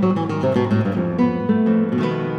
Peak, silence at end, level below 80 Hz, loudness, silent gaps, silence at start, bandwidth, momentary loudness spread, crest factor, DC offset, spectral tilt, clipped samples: -6 dBFS; 0 s; -54 dBFS; -19 LUFS; none; 0 s; 7 kHz; 3 LU; 12 dB; under 0.1%; -9 dB/octave; under 0.1%